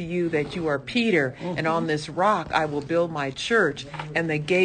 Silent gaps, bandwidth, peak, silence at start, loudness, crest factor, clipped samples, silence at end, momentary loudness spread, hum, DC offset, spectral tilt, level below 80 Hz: none; 9.8 kHz; -8 dBFS; 0 s; -24 LUFS; 16 dB; under 0.1%; 0 s; 6 LU; none; under 0.1%; -5.5 dB/octave; -54 dBFS